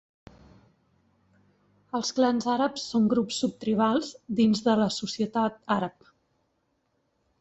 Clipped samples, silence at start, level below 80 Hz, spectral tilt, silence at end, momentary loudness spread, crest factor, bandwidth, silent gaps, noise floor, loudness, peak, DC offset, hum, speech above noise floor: under 0.1%; 1.95 s; -66 dBFS; -5 dB/octave; 1.5 s; 6 LU; 18 dB; 8.2 kHz; none; -74 dBFS; -26 LUFS; -10 dBFS; under 0.1%; none; 48 dB